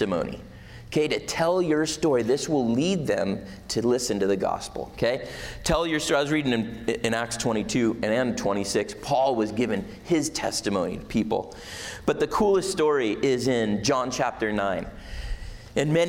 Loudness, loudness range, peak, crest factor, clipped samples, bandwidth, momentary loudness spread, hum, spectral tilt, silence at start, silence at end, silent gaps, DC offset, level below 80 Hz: -25 LUFS; 2 LU; -10 dBFS; 14 dB; under 0.1%; 16.5 kHz; 10 LU; none; -4.5 dB/octave; 0 s; 0 s; none; under 0.1%; -46 dBFS